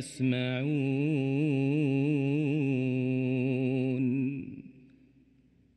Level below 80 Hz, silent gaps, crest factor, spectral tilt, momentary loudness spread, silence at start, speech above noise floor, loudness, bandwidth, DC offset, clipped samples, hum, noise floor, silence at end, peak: -72 dBFS; none; 12 dB; -8 dB/octave; 4 LU; 0 s; 35 dB; -29 LUFS; 11.5 kHz; under 0.1%; under 0.1%; none; -64 dBFS; 1.05 s; -16 dBFS